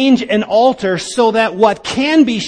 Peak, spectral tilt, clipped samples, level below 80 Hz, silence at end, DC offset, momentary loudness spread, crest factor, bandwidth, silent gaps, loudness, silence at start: 0 dBFS; -4.5 dB/octave; under 0.1%; -50 dBFS; 0 s; under 0.1%; 5 LU; 12 dB; 10.5 kHz; none; -13 LUFS; 0 s